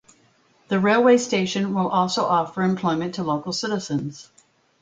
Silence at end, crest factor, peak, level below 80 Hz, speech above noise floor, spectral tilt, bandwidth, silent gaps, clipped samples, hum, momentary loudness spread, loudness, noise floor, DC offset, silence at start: 0.6 s; 16 dB; -6 dBFS; -62 dBFS; 38 dB; -5 dB/octave; 9.2 kHz; none; under 0.1%; none; 9 LU; -22 LUFS; -60 dBFS; under 0.1%; 0.7 s